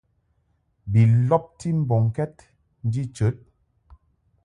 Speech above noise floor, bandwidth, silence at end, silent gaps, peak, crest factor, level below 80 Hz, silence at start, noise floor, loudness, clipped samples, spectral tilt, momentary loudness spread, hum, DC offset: 47 dB; 10 kHz; 1.1 s; none; -6 dBFS; 18 dB; -50 dBFS; 0.85 s; -68 dBFS; -23 LUFS; under 0.1%; -9 dB/octave; 14 LU; none; under 0.1%